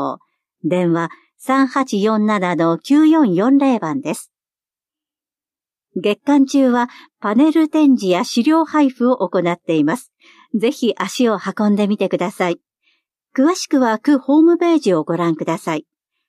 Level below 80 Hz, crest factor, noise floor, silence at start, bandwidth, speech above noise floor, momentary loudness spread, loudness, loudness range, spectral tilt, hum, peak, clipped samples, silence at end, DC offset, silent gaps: -72 dBFS; 12 dB; under -90 dBFS; 0 s; 13.5 kHz; over 74 dB; 12 LU; -16 LUFS; 4 LU; -6 dB/octave; none; -4 dBFS; under 0.1%; 0.45 s; under 0.1%; none